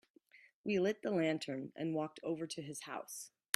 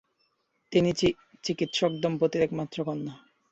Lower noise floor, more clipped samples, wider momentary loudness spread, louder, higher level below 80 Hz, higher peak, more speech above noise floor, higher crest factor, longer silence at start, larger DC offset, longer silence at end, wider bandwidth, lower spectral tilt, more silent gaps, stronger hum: second, -66 dBFS vs -73 dBFS; neither; about the same, 10 LU vs 9 LU; second, -39 LUFS vs -28 LUFS; second, -82 dBFS vs -58 dBFS; about the same, -12 dBFS vs -10 dBFS; second, 27 dB vs 46 dB; first, 28 dB vs 18 dB; second, 0.35 s vs 0.7 s; neither; about the same, 0.25 s vs 0.35 s; first, 14.5 kHz vs 8.2 kHz; about the same, -5 dB/octave vs -5.5 dB/octave; first, 0.54-0.64 s vs none; neither